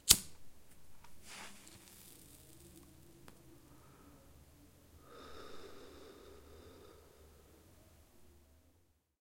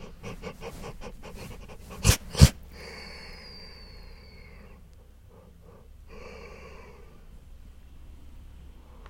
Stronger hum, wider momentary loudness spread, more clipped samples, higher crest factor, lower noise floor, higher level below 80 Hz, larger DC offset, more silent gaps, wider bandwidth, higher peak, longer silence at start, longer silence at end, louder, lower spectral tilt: neither; second, 12 LU vs 29 LU; neither; first, 40 dB vs 32 dB; first, -73 dBFS vs -51 dBFS; second, -64 dBFS vs -36 dBFS; neither; neither; about the same, 16.5 kHz vs 16.5 kHz; second, -4 dBFS vs 0 dBFS; about the same, 0.05 s vs 0 s; first, 0.8 s vs 0 s; second, -36 LUFS vs -26 LUFS; second, -0.5 dB/octave vs -4.5 dB/octave